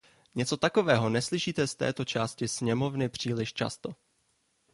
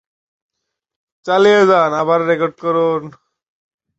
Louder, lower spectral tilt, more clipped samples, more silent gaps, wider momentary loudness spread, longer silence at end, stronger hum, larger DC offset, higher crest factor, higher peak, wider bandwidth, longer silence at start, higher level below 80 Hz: second, -29 LUFS vs -14 LUFS; about the same, -5 dB/octave vs -5.5 dB/octave; neither; neither; about the same, 8 LU vs 8 LU; about the same, 0.8 s vs 0.9 s; neither; neither; first, 22 dB vs 16 dB; second, -10 dBFS vs -2 dBFS; first, 11.5 kHz vs 8 kHz; second, 0.35 s vs 1.25 s; about the same, -62 dBFS vs -62 dBFS